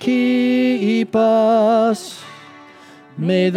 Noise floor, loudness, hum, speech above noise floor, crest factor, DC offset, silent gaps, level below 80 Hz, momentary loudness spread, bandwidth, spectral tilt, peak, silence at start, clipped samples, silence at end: -43 dBFS; -16 LUFS; none; 27 dB; 10 dB; under 0.1%; none; -68 dBFS; 19 LU; 12.5 kHz; -6.5 dB/octave; -6 dBFS; 0 s; under 0.1%; 0 s